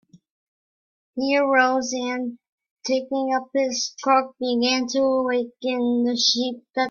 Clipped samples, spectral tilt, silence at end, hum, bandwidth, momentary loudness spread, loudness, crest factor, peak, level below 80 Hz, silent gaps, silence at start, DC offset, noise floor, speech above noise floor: under 0.1%; -2 dB/octave; 0 s; none; 7.2 kHz; 9 LU; -22 LUFS; 18 dB; -4 dBFS; -70 dBFS; 2.49-2.58 s, 2.71-2.76 s; 1.15 s; under 0.1%; under -90 dBFS; over 68 dB